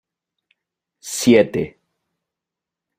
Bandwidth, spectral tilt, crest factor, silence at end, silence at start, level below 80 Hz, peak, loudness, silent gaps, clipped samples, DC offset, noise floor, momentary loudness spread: 16 kHz; -4.5 dB/octave; 20 dB; 1.3 s; 1.05 s; -56 dBFS; -2 dBFS; -17 LUFS; none; under 0.1%; under 0.1%; -86 dBFS; 17 LU